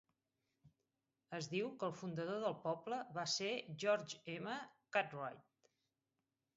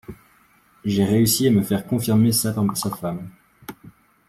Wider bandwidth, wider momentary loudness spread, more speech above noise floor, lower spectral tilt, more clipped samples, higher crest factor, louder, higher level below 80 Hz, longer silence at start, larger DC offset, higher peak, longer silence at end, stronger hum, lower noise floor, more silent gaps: second, 7.6 kHz vs 16 kHz; second, 10 LU vs 23 LU; first, over 47 dB vs 37 dB; second, -3 dB/octave vs -5.5 dB/octave; neither; first, 22 dB vs 16 dB; second, -43 LUFS vs -20 LUFS; second, -88 dBFS vs -54 dBFS; first, 0.65 s vs 0.1 s; neither; second, -22 dBFS vs -6 dBFS; first, 1.15 s vs 0.4 s; neither; first, under -90 dBFS vs -57 dBFS; neither